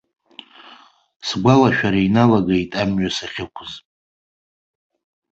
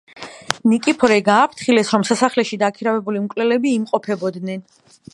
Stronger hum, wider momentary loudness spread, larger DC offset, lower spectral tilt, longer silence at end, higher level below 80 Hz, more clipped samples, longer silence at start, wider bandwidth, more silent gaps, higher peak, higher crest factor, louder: neither; first, 17 LU vs 12 LU; neither; first, -6 dB/octave vs -4.5 dB/octave; first, 1.55 s vs 0.5 s; first, -48 dBFS vs -64 dBFS; neither; first, 0.7 s vs 0.15 s; second, 8 kHz vs 11.5 kHz; neither; about the same, 0 dBFS vs 0 dBFS; about the same, 20 dB vs 18 dB; about the same, -17 LUFS vs -18 LUFS